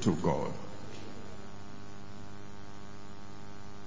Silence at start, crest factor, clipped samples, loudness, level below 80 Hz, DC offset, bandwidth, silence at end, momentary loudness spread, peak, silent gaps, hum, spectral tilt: 0 s; 26 dB; under 0.1%; -41 LUFS; -56 dBFS; 1%; 7.6 kHz; 0 s; 17 LU; -14 dBFS; none; 50 Hz at -55 dBFS; -6.5 dB/octave